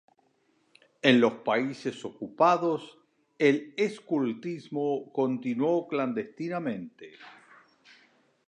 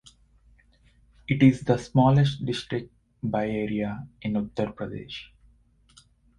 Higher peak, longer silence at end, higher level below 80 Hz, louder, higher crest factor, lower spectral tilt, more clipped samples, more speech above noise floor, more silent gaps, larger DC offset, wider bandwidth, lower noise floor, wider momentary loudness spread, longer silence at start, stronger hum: about the same, -6 dBFS vs -6 dBFS; about the same, 1.15 s vs 1.15 s; second, -80 dBFS vs -52 dBFS; about the same, -28 LUFS vs -26 LUFS; about the same, 24 dB vs 22 dB; second, -6 dB/octave vs -7.5 dB/octave; neither; first, 42 dB vs 36 dB; neither; neither; about the same, 9.8 kHz vs 10.5 kHz; first, -69 dBFS vs -60 dBFS; about the same, 14 LU vs 16 LU; second, 1.05 s vs 1.3 s; neither